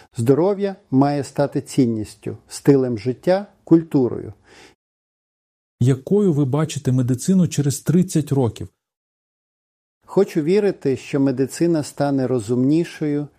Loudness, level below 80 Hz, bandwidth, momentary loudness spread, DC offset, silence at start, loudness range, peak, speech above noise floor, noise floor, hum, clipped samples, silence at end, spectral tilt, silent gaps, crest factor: -19 LUFS; -58 dBFS; 15.5 kHz; 7 LU; under 0.1%; 0.15 s; 3 LU; -2 dBFS; over 71 dB; under -90 dBFS; none; under 0.1%; 0.1 s; -7 dB/octave; 4.75-5.78 s, 8.97-10.01 s; 16 dB